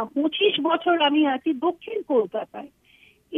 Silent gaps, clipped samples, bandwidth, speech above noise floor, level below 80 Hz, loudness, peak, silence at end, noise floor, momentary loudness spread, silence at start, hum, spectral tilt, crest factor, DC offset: none; under 0.1%; 3.9 kHz; 34 dB; -72 dBFS; -23 LUFS; -6 dBFS; 0 s; -57 dBFS; 12 LU; 0 s; none; -6 dB/octave; 18 dB; under 0.1%